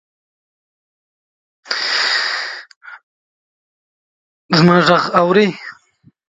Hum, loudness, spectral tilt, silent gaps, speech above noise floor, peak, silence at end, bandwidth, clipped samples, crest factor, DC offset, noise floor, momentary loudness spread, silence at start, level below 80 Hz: none; -14 LUFS; -5 dB/octave; 2.76-2.81 s, 3.03-4.49 s; 42 dB; 0 dBFS; 0.55 s; 9.2 kHz; under 0.1%; 18 dB; under 0.1%; -54 dBFS; 18 LU; 1.65 s; -58 dBFS